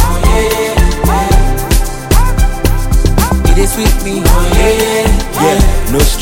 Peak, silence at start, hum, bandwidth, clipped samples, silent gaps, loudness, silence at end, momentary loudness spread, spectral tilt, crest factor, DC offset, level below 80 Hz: 0 dBFS; 0 s; none; 17.5 kHz; under 0.1%; none; -12 LUFS; 0 s; 3 LU; -5 dB/octave; 8 dB; under 0.1%; -10 dBFS